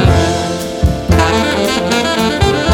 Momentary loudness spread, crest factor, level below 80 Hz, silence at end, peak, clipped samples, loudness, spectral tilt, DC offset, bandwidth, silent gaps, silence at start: 5 LU; 12 dB; -22 dBFS; 0 s; 0 dBFS; under 0.1%; -13 LUFS; -5 dB/octave; under 0.1%; 18 kHz; none; 0 s